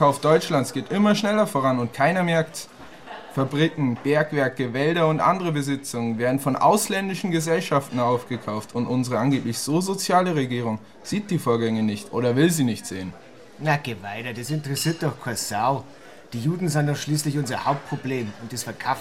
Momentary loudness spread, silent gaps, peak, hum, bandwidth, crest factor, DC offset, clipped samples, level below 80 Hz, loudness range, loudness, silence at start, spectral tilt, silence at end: 11 LU; none; -4 dBFS; none; 16 kHz; 18 dB; 0.3%; under 0.1%; -62 dBFS; 4 LU; -23 LUFS; 0 s; -5.5 dB/octave; 0 s